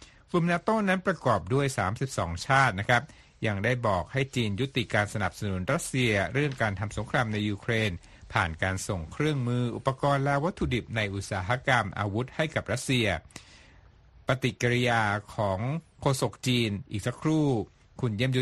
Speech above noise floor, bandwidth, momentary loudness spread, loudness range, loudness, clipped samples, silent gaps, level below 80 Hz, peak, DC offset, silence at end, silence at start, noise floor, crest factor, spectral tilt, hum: 28 dB; 12.5 kHz; 7 LU; 2 LU; -28 LUFS; under 0.1%; none; -50 dBFS; -8 dBFS; under 0.1%; 0 s; 0 s; -55 dBFS; 20 dB; -5.5 dB/octave; none